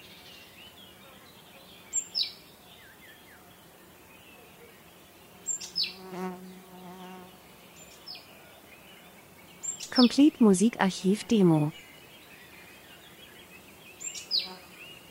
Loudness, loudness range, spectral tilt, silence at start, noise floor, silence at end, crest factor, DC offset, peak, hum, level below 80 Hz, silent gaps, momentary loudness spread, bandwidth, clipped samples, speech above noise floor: -27 LUFS; 17 LU; -4.5 dB/octave; 0.6 s; -54 dBFS; 0.15 s; 24 dB; under 0.1%; -8 dBFS; none; -68 dBFS; none; 28 LU; 16 kHz; under 0.1%; 31 dB